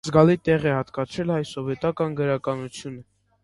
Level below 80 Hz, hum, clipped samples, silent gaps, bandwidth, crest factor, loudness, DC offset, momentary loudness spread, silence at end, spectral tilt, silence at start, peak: -52 dBFS; none; under 0.1%; none; 11.5 kHz; 22 dB; -24 LUFS; under 0.1%; 17 LU; 0.4 s; -7 dB/octave; 0.05 s; -2 dBFS